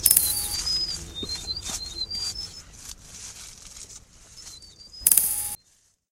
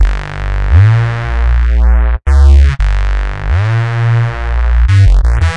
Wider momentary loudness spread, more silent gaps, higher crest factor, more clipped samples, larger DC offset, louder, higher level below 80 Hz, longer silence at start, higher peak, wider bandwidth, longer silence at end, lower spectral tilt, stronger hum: first, 24 LU vs 8 LU; neither; first, 28 dB vs 8 dB; neither; second, under 0.1% vs 2%; second, -24 LUFS vs -11 LUFS; second, -48 dBFS vs -10 dBFS; about the same, 0 s vs 0 s; about the same, 0 dBFS vs 0 dBFS; first, 16 kHz vs 8 kHz; first, 0.55 s vs 0 s; second, 0.5 dB/octave vs -7 dB/octave; neither